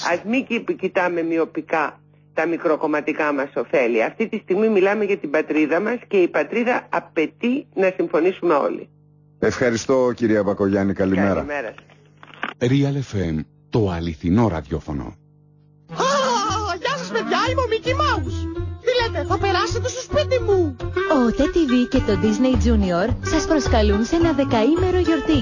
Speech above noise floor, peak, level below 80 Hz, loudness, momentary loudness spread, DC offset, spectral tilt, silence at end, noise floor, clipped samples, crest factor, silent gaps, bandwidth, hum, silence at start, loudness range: 33 dB; -6 dBFS; -34 dBFS; -20 LUFS; 7 LU; under 0.1%; -6 dB/octave; 0 s; -53 dBFS; under 0.1%; 14 dB; none; 7.4 kHz; none; 0 s; 4 LU